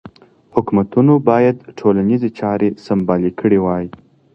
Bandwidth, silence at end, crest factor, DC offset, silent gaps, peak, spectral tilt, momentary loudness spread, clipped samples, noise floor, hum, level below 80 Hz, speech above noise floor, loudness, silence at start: 6.2 kHz; 0.45 s; 16 dB; under 0.1%; none; 0 dBFS; -10 dB/octave; 8 LU; under 0.1%; -42 dBFS; none; -48 dBFS; 27 dB; -16 LUFS; 0.05 s